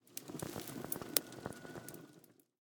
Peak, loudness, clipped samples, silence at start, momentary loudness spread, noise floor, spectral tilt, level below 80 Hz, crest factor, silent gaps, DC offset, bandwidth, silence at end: -6 dBFS; -41 LUFS; under 0.1%; 0.05 s; 17 LU; -64 dBFS; -2.5 dB/octave; -74 dBFS; 40 dB; none; under 0.1%; over 20 kHz; 0.2 s